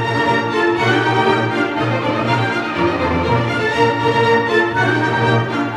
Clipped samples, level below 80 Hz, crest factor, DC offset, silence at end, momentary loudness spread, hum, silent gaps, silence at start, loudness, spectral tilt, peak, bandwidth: under 0.1%; -48 dBFS; 14 dB; under 0.1%; 0 s; 4 LU; none; none; 0 s; -16 LUFS; -6 dB/octave; -2 dBFS; 11.5 kHz